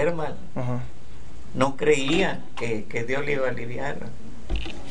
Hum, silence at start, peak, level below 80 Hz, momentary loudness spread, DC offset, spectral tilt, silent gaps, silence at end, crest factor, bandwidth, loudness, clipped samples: none; 0 s; -4 dBFS; -40 dBFS; 20 LU; 6%; -5.5 dB/octave; none; 0 s; 22 dB; 10 kHz; -27 LUFS; under 0.1%